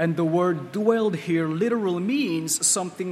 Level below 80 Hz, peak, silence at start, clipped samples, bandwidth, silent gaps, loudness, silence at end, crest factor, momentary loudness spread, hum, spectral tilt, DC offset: -72 dBFS; -6 dBFS; 0 s; under 0.1%; 16 kHz; none; -23 LUFS; 0 s; 16 dB; 4 LU; none; -4.5 dB/octave; under 0.1%